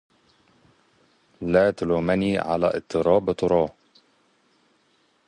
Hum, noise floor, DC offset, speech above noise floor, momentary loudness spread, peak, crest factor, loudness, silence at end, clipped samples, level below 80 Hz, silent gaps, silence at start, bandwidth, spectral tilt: none; -65 dBFS; under 0.1%; 43 dB; 4 LU; -6 dBFS; 20 dB; -23 LUFS; 1.55 s; under 0.1%; -52 dBFS; none; 1.4 s; 10.5 kHz; -7 dB/octave